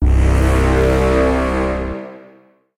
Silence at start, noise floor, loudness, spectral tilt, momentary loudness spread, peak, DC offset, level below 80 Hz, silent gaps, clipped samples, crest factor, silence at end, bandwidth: 0 s; -49 dBFS; -16 LUFS; -7 dB/octave; 12 LU; -4 dBFS; under 0.1%; -18 dBFS; none; under 0.1%; 12 dB; 0.6 s; 12 kHz